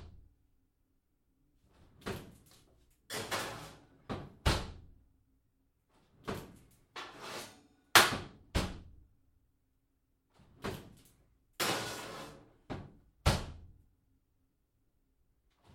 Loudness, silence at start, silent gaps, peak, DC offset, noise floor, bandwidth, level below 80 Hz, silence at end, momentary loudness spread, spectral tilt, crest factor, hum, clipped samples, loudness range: -34 LUFS; 0 s; none; -6 dBFS; under 0.1%; -77 dBFS; 16.5 kHz; -50 dBFS; 2.05 s; 20 LU; -3 dB/octave; 34 dB; none; under 0.1%; 12 LU